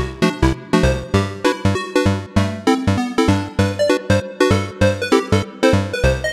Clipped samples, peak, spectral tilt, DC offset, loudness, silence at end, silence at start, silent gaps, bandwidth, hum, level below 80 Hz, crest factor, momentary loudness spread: under 0.1%; -2 dBFS; -6 dB/octave; under 0.1%; -18 LUFS; 0 s; 0 s; none; 14 kHz; none; -30 dBFS; 14 dB; 3 LU